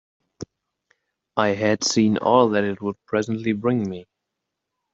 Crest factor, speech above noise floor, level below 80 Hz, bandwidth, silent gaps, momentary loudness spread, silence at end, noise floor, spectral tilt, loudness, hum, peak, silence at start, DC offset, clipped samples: 20 dB; 61 dB; -62 dBFS; 7.8 kHz; none; 22 LU; 0.9 s; -81 dBFS; -4.5 dB/octave; -21 LUFS; none; -4 dBFS; 0.4 s; under 0.1%; under 0.1%